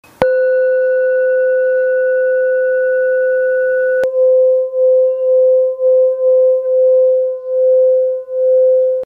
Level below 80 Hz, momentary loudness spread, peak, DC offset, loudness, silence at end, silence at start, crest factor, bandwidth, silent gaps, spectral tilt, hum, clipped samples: -58 dBFS; 3 LU; 0 dBFS; under 0.1%; -13 LUFS; 0 s; 0.2 s; 12 dB; 3.2 kHz; none; -6 dB/octave; none; under 0.1%